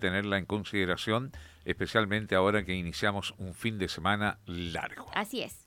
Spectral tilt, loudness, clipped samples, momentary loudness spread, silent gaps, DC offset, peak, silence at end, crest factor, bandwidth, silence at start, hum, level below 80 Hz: -5 dB/octave; -31 LUFS; under 0.1%; 9 LU; none; under 0.1%; -12 dBFS; 0.05 s; 20 dB; 17.5 kHz; 0 s; none; -54 dBFS